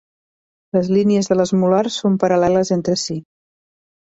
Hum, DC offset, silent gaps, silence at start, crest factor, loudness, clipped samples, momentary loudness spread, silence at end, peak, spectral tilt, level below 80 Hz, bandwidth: none; under 0.1%; none; 0.75 s; 16 dB; -17 LUFS; under 0.1%; 6 LU; 0.95 s; -2 dBFS; -6 dB/octave; -54 dBFS; 8 kHz